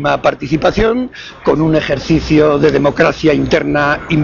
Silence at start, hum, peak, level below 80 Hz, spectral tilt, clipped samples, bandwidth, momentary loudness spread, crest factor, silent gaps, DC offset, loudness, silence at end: 0 s; none; 0 dBFS; -32 dBFS; -6.5 dB/octave; under 0.1%; 7.2 kHz; 5 LU; 12 dB; none; under 0.1%; -13 LUFS; 0 s